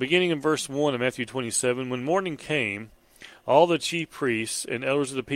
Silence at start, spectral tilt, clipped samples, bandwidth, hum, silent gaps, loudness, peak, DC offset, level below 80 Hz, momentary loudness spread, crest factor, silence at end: 0 s; -4 dB/octave; under 0.1%; 16.5 kHz; none; none; -25 LUFS; -4 dBFS; under 0.1%; -64 dBFS; 8 LU; 22 dB; 0 s